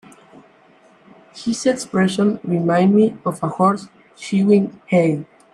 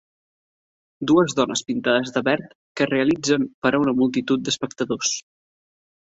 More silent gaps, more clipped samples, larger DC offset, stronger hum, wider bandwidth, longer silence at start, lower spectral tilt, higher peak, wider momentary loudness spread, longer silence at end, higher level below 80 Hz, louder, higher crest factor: second, none vs 2.55-2.75 s, 3.54-3.62 s; neither; neither; neither; first, 11.5 kHz vs 8 kHz; first, 1.35 s vs 1 s; first, -6.5 dB/octave vs -4 dB/octave; first, -2 dBFS vs -6 dBFS; first, 10 LU vs 7 LU; second, 0.3 s vs 0.95 s; about the same, -62 dBFS vs -62 dBFS; first, -18 LUFS vs -21 LUFS; about the same, 16 dB vs 18 dB